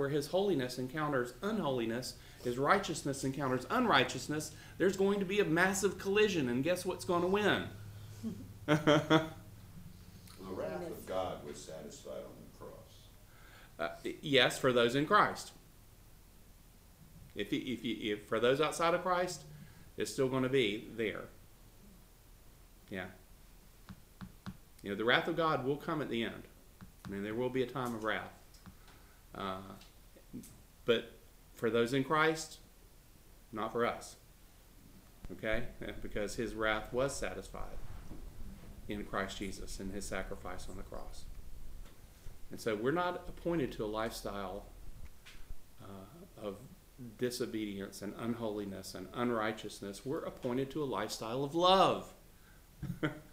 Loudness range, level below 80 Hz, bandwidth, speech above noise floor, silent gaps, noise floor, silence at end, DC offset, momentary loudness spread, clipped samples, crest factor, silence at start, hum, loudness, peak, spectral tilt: 11 LU; -54 dBFS; 16 kHz; 25 dB; none; -59 dBFS; 0 s; under 0.1%; 23 LU; under 0.1%; 24 dB; 0 s; none; -35 LUFS; -12 dBFS; -4.5 dB/octave